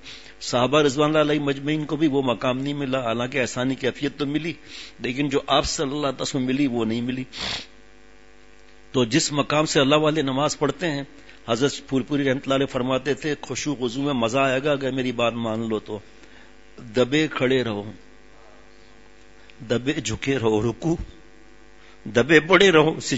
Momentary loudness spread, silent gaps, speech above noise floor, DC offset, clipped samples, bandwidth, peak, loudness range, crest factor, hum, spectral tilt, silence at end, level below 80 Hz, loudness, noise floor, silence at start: 10 LU; none; 29 dB; 0.4%; under 0.1%; 8 kHz; -2 dBFS; 5 LU; 22 dB; none; -4.5 dB/octave; 0 s; -50 dBFS; -22 LUFS; -52 dBFS; 0.05 s